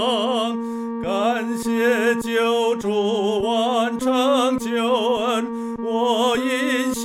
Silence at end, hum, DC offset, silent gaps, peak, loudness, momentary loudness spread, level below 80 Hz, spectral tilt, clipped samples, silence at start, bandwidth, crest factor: 0 s; none; under 0.1%; none; -8 dBFS; -21 LUFS; 6 LU; -56 dBFS; -3.5 dB/octave; under 0.1%; 0 s; 16 kHz; 12 dB